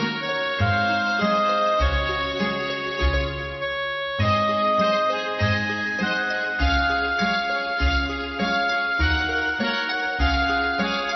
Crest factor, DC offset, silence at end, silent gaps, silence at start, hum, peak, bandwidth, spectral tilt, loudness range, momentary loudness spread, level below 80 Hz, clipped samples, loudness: 14 dB; under 0.1%; 0 s; none; 0 s; none; -8 dBFS; 6.2 kHz; -5.5 dB/octave; 1 LU; 5 LU; -32 dBFS; under 0.1%; -22 LUFS